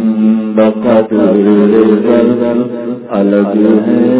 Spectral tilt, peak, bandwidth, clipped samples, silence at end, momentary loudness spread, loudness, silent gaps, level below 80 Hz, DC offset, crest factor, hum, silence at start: -12 dB/octave; 0 dBFS; 4 kHz; 0.6%; 0 s; 6 LU; -10 LUFS; none; -52 dBFS; under 0.1%; 8 dB; none; 0 s